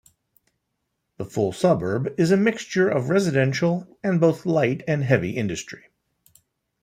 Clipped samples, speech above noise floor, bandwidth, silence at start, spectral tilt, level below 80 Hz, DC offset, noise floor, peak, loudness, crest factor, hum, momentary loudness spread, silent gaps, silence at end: under 0.1%; 56 dB; 14.5 kHz; 1.2 s; -6.5 dB/octave; -60 dBFS; under 0.1%; -77 dBFS; -2 dBFS; -22 LUFS; 20 dB; none; 9 LU; none; 1.05 s